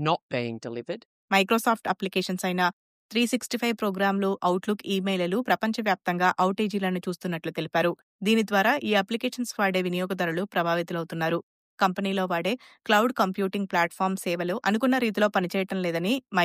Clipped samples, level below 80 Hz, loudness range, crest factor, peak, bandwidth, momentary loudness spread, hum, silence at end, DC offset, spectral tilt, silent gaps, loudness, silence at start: under 0.1%; -74 dBFS; 2 LU; 18 dB; -8 dBFS; 15.5 kHz; 8 LU; none; 0 s; under 0.1%; -5 dB/octave; 0.22-0.29 s, 1.05-1.28 s, 2.73-3.09 s, 8.03-8.19 s, 11.43-11.78 s; -26 LUFS; 0 s